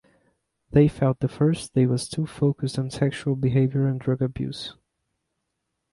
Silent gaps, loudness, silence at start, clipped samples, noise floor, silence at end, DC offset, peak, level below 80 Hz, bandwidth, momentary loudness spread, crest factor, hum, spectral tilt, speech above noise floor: none; -24 LUFS; 0.7 s; under 0.1%; -79 dBFS; 1.2 s; under 0.1%; -6 dBFS; -52 dBFS; 11.5 kHz; 9 LU; 18 dB; none; -7.5 dB/octave; 56 dB